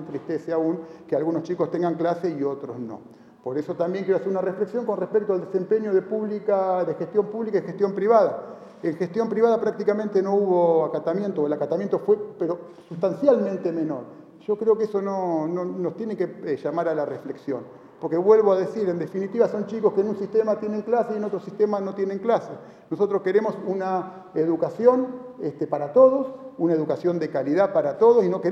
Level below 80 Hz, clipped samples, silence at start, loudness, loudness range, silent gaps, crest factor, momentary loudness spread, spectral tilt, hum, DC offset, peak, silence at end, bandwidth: -72 dBFS; under 0.1%; 0 s; -24 LUFS; 4 LU; none; 20 dB; 12 LU; -8.5 dB/octave; none; under 0.1%; -4 dBFS; 0 s; 7 kHz